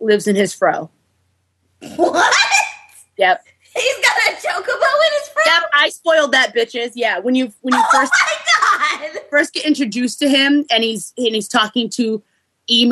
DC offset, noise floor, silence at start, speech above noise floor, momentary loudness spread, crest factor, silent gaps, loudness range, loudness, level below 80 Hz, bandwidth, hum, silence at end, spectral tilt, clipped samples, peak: under 0.1%; -64 dBFS; 0 s; 48 dB; 9 LU; 16 dB; none; 2 LU; -15 LUFS; -68 dBFS; 13 kHz; none; 0 s; -2 dB/octave; under 0.1%; 0 dBFS